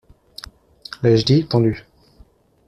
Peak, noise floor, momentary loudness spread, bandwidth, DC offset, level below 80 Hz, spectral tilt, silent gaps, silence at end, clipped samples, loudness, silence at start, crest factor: -4 dBFS; -52 dBFS; 22 LU; 11 kHz; under 0.1%; -48 dBFS; -7.5 dB/octave; none; 0.9 s; under 0.1%; -17 LUFS; 1 s; 18 dB